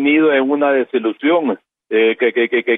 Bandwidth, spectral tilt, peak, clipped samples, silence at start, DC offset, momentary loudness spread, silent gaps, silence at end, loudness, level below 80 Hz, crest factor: 4 kHz; -8.5 dB/octave; -4 dBFS; under 0.1%; 0 s; under 0.1%; 7 LU; none; 0 s; -16 LUFS; -70 dBFS; 12 dB